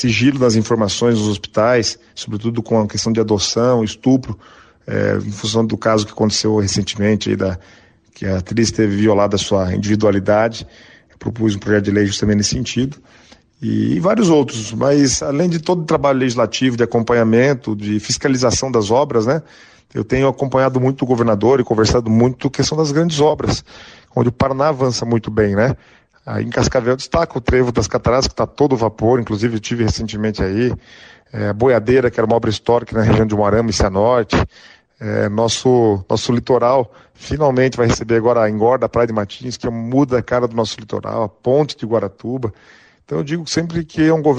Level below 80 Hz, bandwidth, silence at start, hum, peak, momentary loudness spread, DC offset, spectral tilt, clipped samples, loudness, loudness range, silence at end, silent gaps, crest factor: -38 dBFS; 10 kHz; 0 s; none; -4 dBFS; 9 LU; under 0.1%; -5.5 dB/octave; under 0.1%; -16 LUFS; 3 LU; 0 s; none; 14 dB